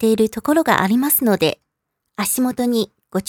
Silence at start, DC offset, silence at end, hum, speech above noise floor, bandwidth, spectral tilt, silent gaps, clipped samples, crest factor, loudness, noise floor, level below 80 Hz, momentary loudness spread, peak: 0 s; under 0.1%; 0.05 s; none; 59 dB; over 20 kHz; -4 dB/octave; none; under 0.1%; 18 dB; -18 LUFS; -76 dBFS; -54 dBFS; 9 LU; 0 dBFS